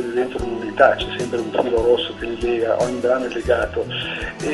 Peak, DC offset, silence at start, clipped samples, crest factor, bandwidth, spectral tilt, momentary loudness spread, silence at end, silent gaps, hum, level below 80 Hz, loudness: 0 dBFS; under 0.1%; 0 s; under 0.1%; 20 dB; 11.5 kHz; -5 dB/octave; 9 LU; 0 s; none; none; -40 dBFS; -20 LUFS